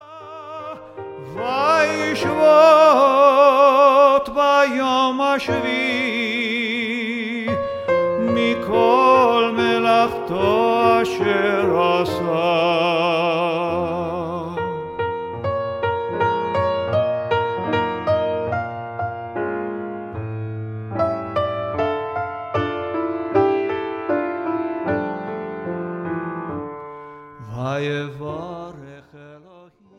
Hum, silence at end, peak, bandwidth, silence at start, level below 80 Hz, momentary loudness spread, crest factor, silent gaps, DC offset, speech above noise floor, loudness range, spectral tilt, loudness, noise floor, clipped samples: none; 0.6 s; -2 dBFS; 14 kHz; 0.05 s; -54 dBFS; 17 LU; 18 dB; none; under 0.1%; 32 dB; 13 LU; -6 dB/octave; -19 LUFS; -49 dBFS; under 0.1%